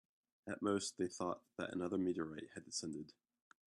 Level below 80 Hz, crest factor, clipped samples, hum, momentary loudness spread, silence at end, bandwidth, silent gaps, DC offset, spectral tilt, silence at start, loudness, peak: -80 dBFS; 18 dB; under 0.1%; none; 12 LU; 0.55 s; 12.5 kHz; none; under 0.1%; -4.5 dB/octave; 0.45 s; -43 LUFS; -26 dBFS